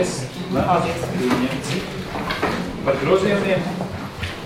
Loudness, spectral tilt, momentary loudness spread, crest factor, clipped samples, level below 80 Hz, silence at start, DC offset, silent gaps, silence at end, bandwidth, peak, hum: -22 LUFS; -5.5 dB/octave; 10 LU; 18 dB; under 0.1%; -42 dBFS; 0 s; under 0.1%; none; 0 s; 16.5 kHz; -4 dBFS; none